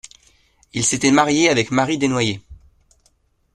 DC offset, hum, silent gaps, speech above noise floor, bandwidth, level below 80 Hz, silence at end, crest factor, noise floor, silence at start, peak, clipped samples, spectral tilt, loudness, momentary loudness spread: under 0.1%; none; none; 44 dB; 12.5 kHz; -52 dBFS; 1 s; 20 dB; -62 dBFS; 0.75 s; -2 dBFS; under 0.1%; -3.5 dB/octave; -17 LUFS; 9 LU